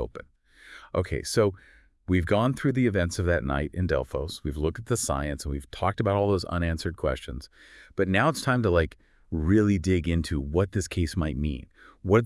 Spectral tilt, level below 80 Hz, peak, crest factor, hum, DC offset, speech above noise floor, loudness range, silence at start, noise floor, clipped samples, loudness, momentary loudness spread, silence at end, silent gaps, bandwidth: -6 dB/octave; -42 dBFS; -8 dBFS; 20 dB; none; under 0.1%; 24 dB; 3 LU; 0 s; -50 dBFS; under 0.1%; -27 LUFS; 11 LU; 0 s; none; 12 kHz